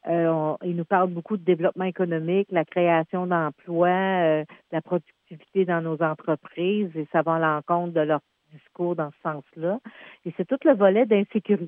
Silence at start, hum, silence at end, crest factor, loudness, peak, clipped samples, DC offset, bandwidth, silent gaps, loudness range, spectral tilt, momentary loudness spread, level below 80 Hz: 0.05 s; none; 0 s; 18 dB; -24 LUFS; -6 dBFS; under 0.1%; under 0.1%; 3.7 kHz; none; 3 LU; -10.5 dB/octave; 9 LU; -84 dBFS